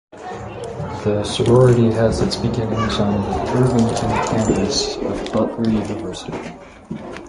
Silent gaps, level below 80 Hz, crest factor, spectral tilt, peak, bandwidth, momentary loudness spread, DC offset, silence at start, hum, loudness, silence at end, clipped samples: none; -36 dBFS; 16 dB; -6 dB/octave; -2 dBFS; 11.5 kHz; 17 LU; under 0.1%; 0.15 s; none; -18 LUFS; 0 s; under 0.1%